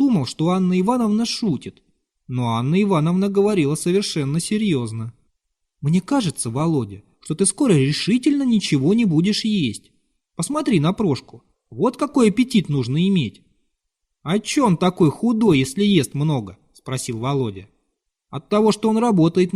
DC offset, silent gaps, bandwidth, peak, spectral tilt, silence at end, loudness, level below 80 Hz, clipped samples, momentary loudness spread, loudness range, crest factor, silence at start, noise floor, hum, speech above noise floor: under 0.1%; none; 13 kHz; -4 dBFS; -6 dB/octave; 0.05 s; -19 LUFS; -54 dBFS; under 0.1%; 12 LU; 3 LU; 16 dB; 0 s; -77 dBFS; none; 58 dB